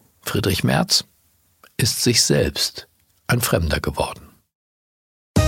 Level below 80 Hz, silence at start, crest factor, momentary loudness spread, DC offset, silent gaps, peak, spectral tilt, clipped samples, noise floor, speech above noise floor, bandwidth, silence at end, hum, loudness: -38 dBFS; 0.25 s; 20 dB; 14 LU; under 0.1%; 4.55-5.34 s; -2 dBFS; -3.5 dB/octave; under 0.1%; -61 dBFS; 41 dB; 17 kHz; 0 s; none; -20 LUFS